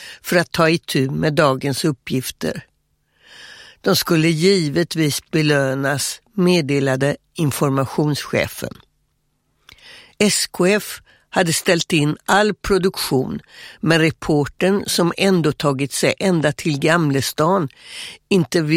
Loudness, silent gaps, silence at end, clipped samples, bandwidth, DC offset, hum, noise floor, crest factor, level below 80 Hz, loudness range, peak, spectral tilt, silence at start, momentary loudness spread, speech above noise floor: -18 LUFS; none; 0 s; under 0.1%; 16.5 kHz; under 0.1%; none; -67 dBFS; 18 dB; -48 dBFS; 4 LU; 0 dBFS; -4.5 dB/octave; 0 s; 9 LU; 49 dB